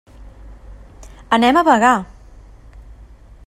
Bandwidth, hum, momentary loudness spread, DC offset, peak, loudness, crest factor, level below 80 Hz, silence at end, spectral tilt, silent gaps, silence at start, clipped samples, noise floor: 15 kHz; none; 8 LU; under 0.1%; 0 dBFS; -14 LUFS; 18 dB; -40 dBFS; 0.45 s; -4.5 dB/octave; none; 0.25 s; under 0.1%; -41 dBFS